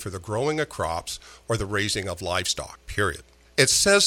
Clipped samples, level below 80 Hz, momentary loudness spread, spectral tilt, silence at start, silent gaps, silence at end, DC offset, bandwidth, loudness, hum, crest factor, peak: under 0.1%; -46 dBFS; 13 LU; -2.5 dB/octave; 0 s; none; 0 s; under 0.1%; 17.5 kHz; -25 LUFS; none; 22 dB; -2 dBFS